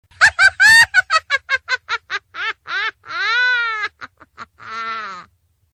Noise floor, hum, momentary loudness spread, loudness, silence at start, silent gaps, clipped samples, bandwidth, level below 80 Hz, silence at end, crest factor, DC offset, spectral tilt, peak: -56 dBFS; none; 18 LU; -15 LUFS; 0.2 s; none; under 0.1%; 15.5 kHz; -54 dBFS; 0.5 s; 18 dB; under 0.1%; 1 dB/octave; 0 dBFS